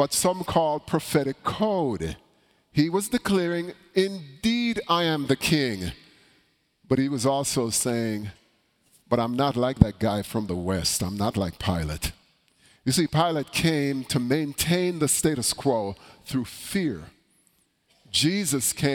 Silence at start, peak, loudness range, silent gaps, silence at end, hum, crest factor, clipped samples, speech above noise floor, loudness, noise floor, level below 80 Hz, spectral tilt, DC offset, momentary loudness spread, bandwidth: 0 s; 0 dBFS; 3 LU; none; 0 s; none; 26 dB; under 0.1%; 42 dB; -25 LUFS; -66 dBFS; -46 dBFS; -4.5 dB/octave; under 0.1%; 8 LU; 19 kHz